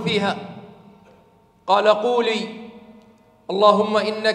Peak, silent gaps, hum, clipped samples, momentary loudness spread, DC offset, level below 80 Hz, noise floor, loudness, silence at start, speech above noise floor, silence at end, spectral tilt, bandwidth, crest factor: 0 dBFS; none; none; under 0.1%; 23 LU; under 0.1%; -68 dBFS; -55 dBFS; -19 LUFS; 0 s; 36 dB; 0 s; -5 dB/octave; 10.5 kHz; 20 dB